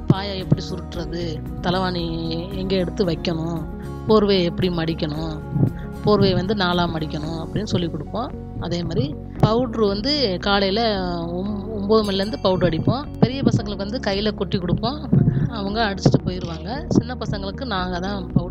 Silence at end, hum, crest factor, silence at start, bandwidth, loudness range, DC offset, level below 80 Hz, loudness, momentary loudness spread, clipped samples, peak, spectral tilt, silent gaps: 0 s; none; 20 dB; 0 s; 11.5 kHz; 3 LU; under 0.1%; -36 dBFS; -22 LUFS; 9 LU; under 0.1%; 0 dBFS; -7 dB/octave; none